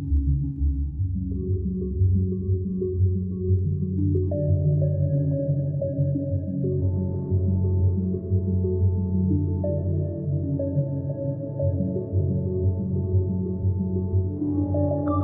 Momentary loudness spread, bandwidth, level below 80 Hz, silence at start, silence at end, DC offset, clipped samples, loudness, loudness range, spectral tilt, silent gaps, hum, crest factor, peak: 4 LU; 1.5 kHz; -36 dBFS; 0 s; 0 s; under 0.1%; under 0.1%; -25 LUFS; 2 LU; -16 dB/octave; none; none; 12 dB; -12 dBFS